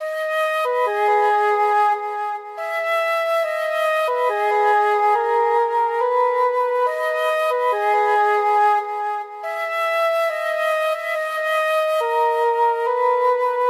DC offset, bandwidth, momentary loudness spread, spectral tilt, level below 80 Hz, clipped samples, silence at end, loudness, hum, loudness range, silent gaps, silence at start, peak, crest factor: under 0.1%; 15.5 kHz; 6 LU; 0 dB/octave; -84 dBFS; under 0.1%; 0 s; -19 LUFS; none; 2 LU; none; 0 s; -8 dBFS; 12 dB